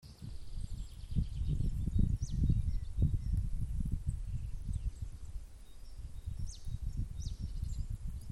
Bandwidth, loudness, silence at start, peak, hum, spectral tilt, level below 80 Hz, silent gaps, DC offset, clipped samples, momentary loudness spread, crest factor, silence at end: 12 kHz; -39 LUFS; 0.05 s; -16 dBFS; none; -7.5 dB/octave; -38 dBFS; none; under 0.1%; under 0.1%; 15 LU; 18 dB; 0 s